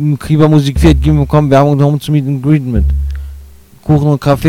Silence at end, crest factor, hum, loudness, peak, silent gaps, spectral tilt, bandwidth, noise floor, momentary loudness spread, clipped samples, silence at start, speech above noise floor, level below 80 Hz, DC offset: 0 s; 10 dB; none; -11 LUFS; 0 dBFS; none; -8 dB/octave; 14.5 kHz; -35 dBFS; 11 LU; 1%; 0 s; 26 dB; -20 dBFS; under 0.1%